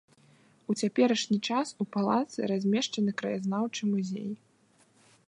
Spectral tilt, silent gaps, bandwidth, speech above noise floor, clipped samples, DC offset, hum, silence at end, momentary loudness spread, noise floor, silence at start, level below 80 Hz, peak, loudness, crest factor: -5 dB/octave; none; 11 kHz; 36 dB; under 0.1%; under 0.1%; none; 0.95 s; 9 LU; -65 dBFS; 0.7 s; -80 dBFS; -12 dBFS; -30 LUFS; 18 dB